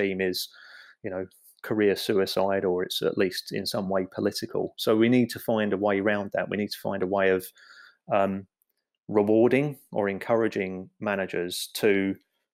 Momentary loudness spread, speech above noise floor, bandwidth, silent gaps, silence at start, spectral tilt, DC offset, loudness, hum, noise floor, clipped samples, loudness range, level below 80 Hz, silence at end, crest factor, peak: 11 LU; 51 dB; 16 kHz; none; 0 s; -5 dB/octave; under 0.1%; -26 LUFS; none; -77 dBFS; under 0.1%; 2 LU; -72 dBFS; 0.35 s; 18 dB; -10 dBFS